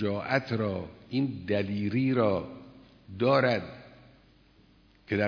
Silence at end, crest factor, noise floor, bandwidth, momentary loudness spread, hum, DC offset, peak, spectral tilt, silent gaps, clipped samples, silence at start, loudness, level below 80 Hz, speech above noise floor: 0 s; 20 dB; -60 dBFS; 5.4 kHz; 19 LU; none; under 0.1%; -10 dBFS; -8 dB/octave; none; under 0.1%; 0 s; -29 LUFS; -62 dBFS; 32 dB